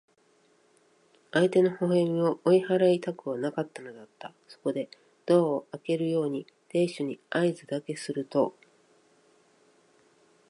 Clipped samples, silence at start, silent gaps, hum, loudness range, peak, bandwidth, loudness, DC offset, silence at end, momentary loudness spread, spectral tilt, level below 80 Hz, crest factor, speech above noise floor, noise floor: under 0.1%; 1.35 s; none; none; 5 LU; -12 dBFS; 11.5 kHz; -28 LUFS; under 0.1%; 2 s; 16 LU; -7 dB/octave; -78 dBFS; 18 dB; 38 dB; -65 dBFS